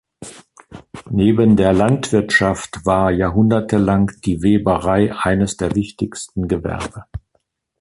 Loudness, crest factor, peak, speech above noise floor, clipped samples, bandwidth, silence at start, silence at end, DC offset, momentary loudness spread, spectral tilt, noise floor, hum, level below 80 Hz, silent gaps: -17 LUFS; 14 dB; -2 dBFS; 51 dB; under 0.1%; 11.5 kHz; 0.2 s; 0.65 s; under 0.1%; 21 LU; -6.5 dB/octave; -67 dBFS; none; -38 dBFS; none